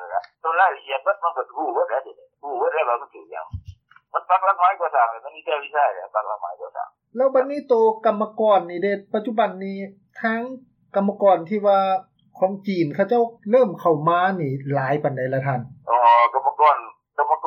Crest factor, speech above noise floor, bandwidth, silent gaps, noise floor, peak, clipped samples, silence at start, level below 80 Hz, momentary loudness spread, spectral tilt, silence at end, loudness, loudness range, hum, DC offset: 16 dB; 24 dB; 6.2 kHz; none; -45 dBFS; -6 dBFS; under 0.1%; 0 s; -60 dBFS; 14 LU; -8.5 dB/octave; 0 s; -21 LUFS; 4 LU; none; under 0.1%